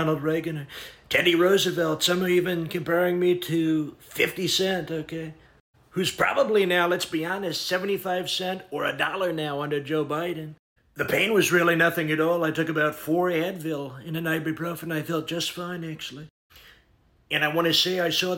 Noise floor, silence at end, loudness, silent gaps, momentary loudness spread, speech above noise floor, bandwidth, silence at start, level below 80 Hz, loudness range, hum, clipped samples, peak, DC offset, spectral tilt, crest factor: -62 dBFS; 0 s; -25 LUFS; 5.60-5.73 s, 10.59-10.76 s, 16.30-16.50 s; 13 LU; 37 dB; 17 kHz; 0 s; -62 dBFS; 5 LU; none; under 0.1%; -8 dBFS; under 0.1%; -4 dB/octave; 18 dB